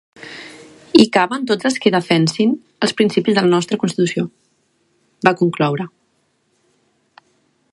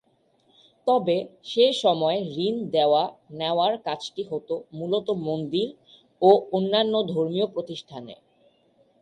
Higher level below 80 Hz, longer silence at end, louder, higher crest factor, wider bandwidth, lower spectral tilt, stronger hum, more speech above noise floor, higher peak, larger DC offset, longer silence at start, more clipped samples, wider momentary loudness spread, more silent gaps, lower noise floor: first, -60 dBFS vs -70 dBFS; first, 1.85 s vs 0.85 s; first, -16 LUFS vs -24 LUFS; about the same, 18 dB vs 20 dB; about the same, 11.5 kHz vs 11.5 kHz; about the same, -5.5 dB/octave vs -6 dB/octave; neither; first, 48 dB vs 41 dB; first, 0 dBFS vs -4 dBFS; neither; second, 0.2 s vs 0.85 s; neither; first, 17 LU vs 12 LU; neither; about the same, -64 dBFS vs -65 dBFS